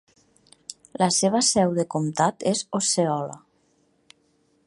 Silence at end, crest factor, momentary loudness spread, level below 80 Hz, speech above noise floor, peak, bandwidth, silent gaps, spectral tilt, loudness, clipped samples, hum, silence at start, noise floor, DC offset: 1.3 s; 20 dB; 20 LU; -66 dBFS; 43 dB; -6 dBFS; 11.5 kHz; none; -4 dB/octave; -22 LUFS; under 0.1%; none; 0.7 s; -65 dBFS; under 0.1%